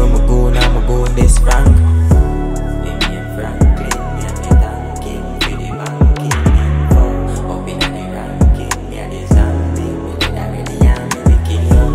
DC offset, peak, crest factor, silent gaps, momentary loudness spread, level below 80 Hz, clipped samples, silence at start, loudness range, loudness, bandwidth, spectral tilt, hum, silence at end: under 0.1%; 0 dBFS; 12 dB; none; 11 LU; -14 dBFS; under 0.1%; 0 s; 3 LU; -15 LUFS; 14.5 kHz; -6 dB/octave; none; 0 s